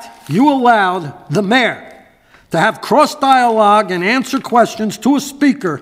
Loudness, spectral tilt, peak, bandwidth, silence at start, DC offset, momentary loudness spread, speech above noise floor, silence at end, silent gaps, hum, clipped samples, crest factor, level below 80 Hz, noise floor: -13 LUFS; -5 dB/octave; 0 dBFS; 16 kHz; 0 s; under 0.1%; 8 LU; 34 dB; 0 s; none; none; under 0.1%; 14 dB; -58 dBFS; -47 dBFS